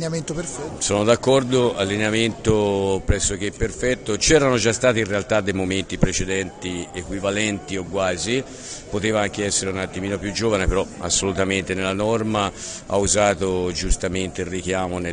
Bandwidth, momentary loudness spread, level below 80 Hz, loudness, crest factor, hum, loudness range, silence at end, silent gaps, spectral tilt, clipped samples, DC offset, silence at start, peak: 10 kHz; 9 LU; -34 dBFS; -21 LUFS; 20 dB; none; 4 LU; 0 s; none; -4 dB/octave; under 0.1%; under 0.1%; 0 s; 0 dBFS